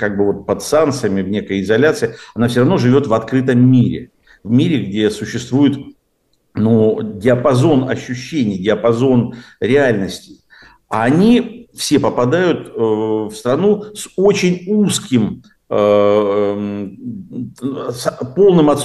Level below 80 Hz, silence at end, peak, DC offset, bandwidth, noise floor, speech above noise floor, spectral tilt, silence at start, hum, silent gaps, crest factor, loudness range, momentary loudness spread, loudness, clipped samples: -50 dBFS; 0 s; -2 dBFS; 0.1%; 12.5 kHz; -63 dBFS; 48 dB; -6.5 dB/octave; 0 s; none; none; 12 dB; 2 LU; 12 LU; -15 LUFS; under 0.1%